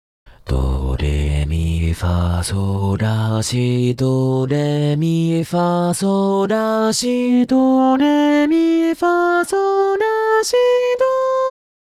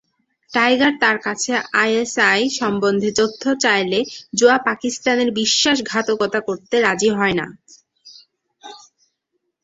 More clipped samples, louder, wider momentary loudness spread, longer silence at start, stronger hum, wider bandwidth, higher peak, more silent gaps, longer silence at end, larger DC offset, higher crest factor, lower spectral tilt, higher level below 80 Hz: neither; about the same, -17 LUFS vs -17 LUFS; about the same, 6 LU vs 6 LU; about the same, 0.45 s vs 0.5 s; neither; first, 15 kHz vs 8.2 kHz; second, -6 dBFS vs 0 dBFS; neither; second, 0.5 s vs 0.85 s; neither; second, 10 dB vs 18 dB; first, -6 dB/octave vs -3 dB/octave; first, -30 dBFS vs -60 dBFS